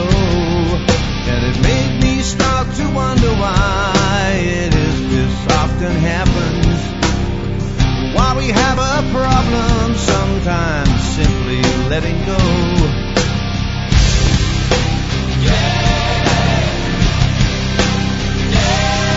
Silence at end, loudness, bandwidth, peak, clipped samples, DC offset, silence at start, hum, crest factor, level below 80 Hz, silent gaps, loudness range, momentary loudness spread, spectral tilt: 0 s; -15 LUFS; 8 kHz; 0 dBFS; under 0.1%; under 0.1%; 0 s; none; 14 dB; -20 dBFS; none; 1 LU; 3 LU; -5 dB/octave